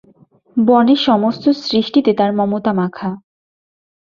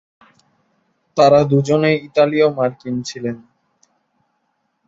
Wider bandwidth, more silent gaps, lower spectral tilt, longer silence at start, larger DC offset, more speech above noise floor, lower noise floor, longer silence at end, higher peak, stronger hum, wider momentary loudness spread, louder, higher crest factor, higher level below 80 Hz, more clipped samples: second, 7 kHz vs 8 kHz; neither; about the same, -7 dB/octave vs -6.5 dB/octave; second, 0.55 s vs 1.15 s; neither; second, 36 dB vs 53 dB; second, -50 dBFS vs -69 dBFS; second, 0.95 s vs 1.5 s; about the same, -2 dBFS vs -2 dBFS; neither; about the same, 12 LU vs 14 LU; about the same, -15 LUFS vs -16 LUFS; about the same, 14 dB vs 18 dB; about the same, -58 dBFS vs -58 dBFS; neither